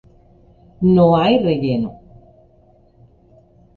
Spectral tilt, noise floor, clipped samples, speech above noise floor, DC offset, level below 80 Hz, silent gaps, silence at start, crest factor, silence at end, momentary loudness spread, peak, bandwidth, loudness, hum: -10 dB/octave; -52 dBFS; under 0.1%; 38 dB; under 0.1%; -48 dBFS; none; 0.8 s; 16 dB; 1.85 s; 10 LU; -2 dBFS; 4.6 kHz; -16 LUFS; none